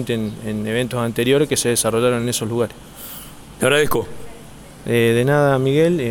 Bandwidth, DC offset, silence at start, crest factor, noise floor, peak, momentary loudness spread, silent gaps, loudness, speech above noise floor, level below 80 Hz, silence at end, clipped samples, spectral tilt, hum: 17.5 kHz; under 0.1%; 0 s; 16 dB; -39 dBFS; -2 dBFS; 18 LU; none; -18 LUFS; 21 dB; -46 dBFS; 0 s; under 0.1%; -4.5 dB/octave; none